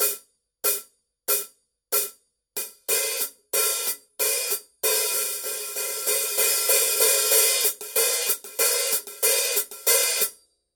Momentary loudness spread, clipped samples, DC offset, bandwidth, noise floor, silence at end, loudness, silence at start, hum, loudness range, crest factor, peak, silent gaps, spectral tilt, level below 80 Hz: 10 LU; under 0.1%; under 0.1%; 18 kHz; -48 dBFS; 0.4 s; -22 LUFS; 0 s; none; 6 LU; 20 dB; -6 dBFS; none; 3 dB/octave; -76 dBFS